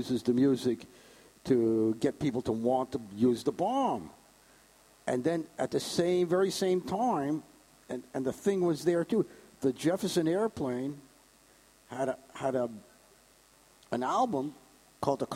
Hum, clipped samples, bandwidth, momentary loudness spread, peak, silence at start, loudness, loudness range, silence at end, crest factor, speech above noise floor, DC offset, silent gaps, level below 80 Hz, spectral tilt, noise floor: none; under 0.1%; 16 kHz; 11 LU; -14 dBFS; 0 s; -31 LUFS; 5 LU; 0 s; 18 dB; 32 dB; under 0.1%; none; -66 dBFS; -6 dB/octave; -62 dBFS